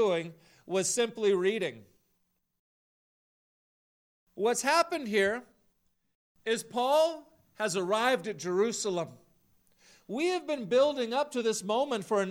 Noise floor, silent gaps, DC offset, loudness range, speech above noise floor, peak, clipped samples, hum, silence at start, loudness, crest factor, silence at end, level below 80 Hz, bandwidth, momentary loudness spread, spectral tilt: -77 dBFS; 2.59-4.27 s, 6.15-6.35 s; under 0.1%; 4 LU; 48 dB; -12 dBFS; under 0.1%; none; 0 s; -30 LUFS; 20 dB; 0 s; -76 dBFS; 16.5 kHz; 9 LU; -3 dB/octave